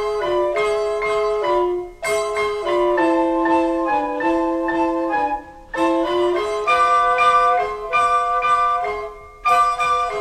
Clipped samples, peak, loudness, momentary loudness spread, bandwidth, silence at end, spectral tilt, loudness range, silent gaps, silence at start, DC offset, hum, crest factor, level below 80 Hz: under 0.1%; -4 dBFS; -19 LUFS; 7 LU; 13.5 kHz; 0 s; -4 dB/octave; 3 LU; none; 0 s; under 0.1%; none; 14 dB; -46 dBFS